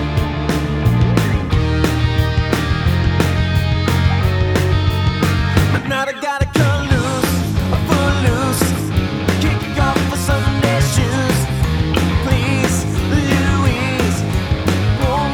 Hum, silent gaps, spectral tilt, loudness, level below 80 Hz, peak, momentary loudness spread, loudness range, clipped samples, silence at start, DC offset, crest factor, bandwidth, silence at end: none; none; -5.5 dB/octave; -16 LUFS; -26 dBFS; 0 dBFS; 3 LU; 1 LU; under 0.1%; 0 s; under 0.1%; 16 dB; 19.5 kHz; 0 s